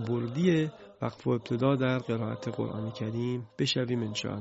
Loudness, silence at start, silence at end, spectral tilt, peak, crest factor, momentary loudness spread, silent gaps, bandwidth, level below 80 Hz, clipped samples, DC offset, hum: -31 LUFS; 0 s; 0 s; -6.5 dB/octave; -12 dBFS; 18 dB; 8 LU; none; 8 kHz; -62 dBFS; under 0.1%; under 0.1%; none